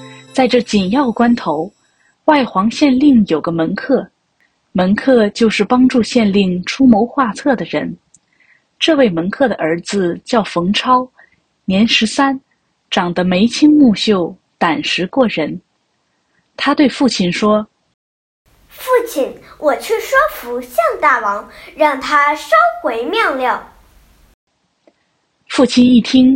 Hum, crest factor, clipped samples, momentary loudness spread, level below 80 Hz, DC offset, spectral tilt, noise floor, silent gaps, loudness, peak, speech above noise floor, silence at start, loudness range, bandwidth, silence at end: none; 14 dB; under 0.1%; 10 LU; -48 dBFS; under 0.1%; -5 dB/octave; -64 dBFS; 17.94-18.45 s, 24.34-24.47 s; -14 LUFS; 0 dBFS; 51 dB; 0 s; 4 LU; 16.5 kHz; 0 s